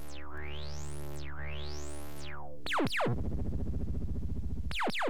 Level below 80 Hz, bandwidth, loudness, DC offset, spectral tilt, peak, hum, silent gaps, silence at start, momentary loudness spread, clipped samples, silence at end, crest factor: -42 dBFS; 18 kHz; -38 LUFS; 2%; -5.5 dB/octave; -20 dBFS; none; none; 0 s; 13 LU; under 0.1%; 0 s; 14 dB